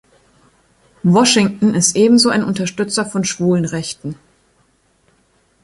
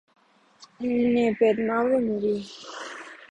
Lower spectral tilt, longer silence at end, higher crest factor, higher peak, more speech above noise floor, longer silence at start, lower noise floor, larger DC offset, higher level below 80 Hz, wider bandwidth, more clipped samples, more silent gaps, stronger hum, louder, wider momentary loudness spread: second, -4 dB/octave vs -6 dB/octave; first, 1.5 s vs 0.05 s; about the same, 16 dB vs 16 dB; first, -2 dBFS vs -10 dBFS; first, 44 dB vs 31 dB; first, 1.05 s vs 0.6 s; about the same, -58 dBFS vs -55 dBFS; neither; first, -54 dBFS vs -62 dBFS; first, 11.5 kHz vs 9.2 kHz; neither; neither; neither; first, -15 LUFS vs -24 LUFS; about the same, 14 LU vs 16 LU